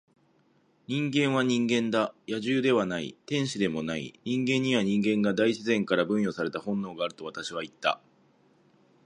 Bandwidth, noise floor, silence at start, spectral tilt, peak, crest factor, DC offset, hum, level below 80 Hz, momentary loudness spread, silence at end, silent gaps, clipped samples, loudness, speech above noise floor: 11 kHz; -66 dBFS; 0.9 s; -5.5 dB/octave; -8 dBFS; 20 dB; under 0.1%; none; -68 dBFS; 9 LU; 1.1 s; none; under 0.1%; -28 LUFS; 38 dB